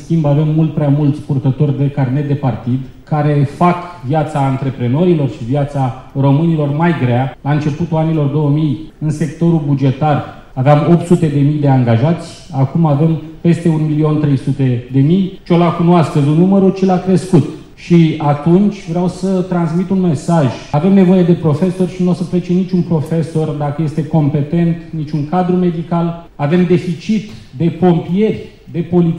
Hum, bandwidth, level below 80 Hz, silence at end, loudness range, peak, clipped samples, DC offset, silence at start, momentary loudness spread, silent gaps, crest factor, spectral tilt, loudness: none; 10.5 kHz; -40 dBFS; 0 s; 3 LU; 0 dBFS; under 0.1%; under 0.1%; 0 s; 7 LU; none; 12 dB; -9 dB/octave; -14 LUFS